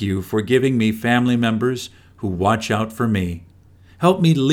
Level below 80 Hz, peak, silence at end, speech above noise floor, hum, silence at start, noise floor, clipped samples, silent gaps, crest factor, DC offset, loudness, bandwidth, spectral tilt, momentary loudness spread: -50 dBFS; -2 dBFS; 0 s; 30 dB; none; 0 s; -48 dBFS; under 0.1%; none; 16 dB; under 0.1%; -19 LUFS; 17.5 kHz; -6.5 dB/octave; 12 LU